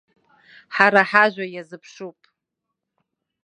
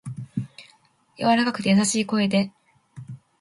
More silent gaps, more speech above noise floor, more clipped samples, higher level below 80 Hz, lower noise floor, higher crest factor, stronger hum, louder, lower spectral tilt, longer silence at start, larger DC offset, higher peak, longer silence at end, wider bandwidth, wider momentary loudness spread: neither; first, 62 dB vs 39 dB; neither; second, -74 dBFS vs -64 dBFS; first, -82 dBFS vs -59 dBFS; first, 24 dB vs 18 dB; neither; first, -17 LUFS vs -23 LUFS; about the same, -5 dB/octave vs -4.5 dB/octave; first, 0.7 s vs 0.05 s; neither; first, 0 dBFS vs -8 dBFS; first, 1.35 s vs 0.25 s; second, 9.8 kHz vs 11.5 kHz; first, 24 LU vs 21 LU